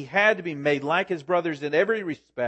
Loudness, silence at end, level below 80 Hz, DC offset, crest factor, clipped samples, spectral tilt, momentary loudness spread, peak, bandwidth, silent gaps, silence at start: -24 LUFS; 0 s; -74 dBFS; under 0.1%; 18 dB; under 0.1%; -5.5 dB/octave; 5 LU; -6 dBFS; 8.6 kHz; none; 0 s